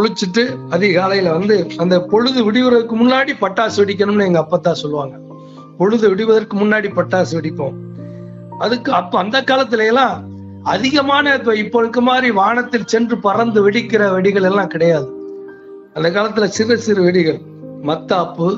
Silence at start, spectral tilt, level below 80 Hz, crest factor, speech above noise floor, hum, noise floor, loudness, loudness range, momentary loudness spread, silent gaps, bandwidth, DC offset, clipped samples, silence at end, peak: 0 s; -5.5 dB/octave; -58 dBFS; 14 dB; 21 dB; none; -36 dBFS; -15 LUFS; 3 LU; 13 LU; none; 7.8 kHz; under 0.1%; under 0.1%; 0 s; 0 dBFS